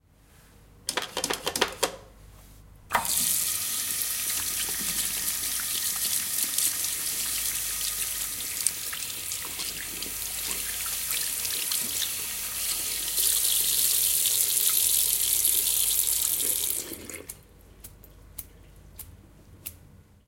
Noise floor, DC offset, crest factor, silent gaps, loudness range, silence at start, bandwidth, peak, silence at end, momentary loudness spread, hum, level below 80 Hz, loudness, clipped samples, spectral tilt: -56 dBFS; under 0.1%; 26 dB; none; 8 LU; 0.75 s; 17 kHz; -2 dBFS; 0.3 s; 11 LU; none; -54 dBFS; -25 LUFS; under 0.1%; 0.5 dB/octave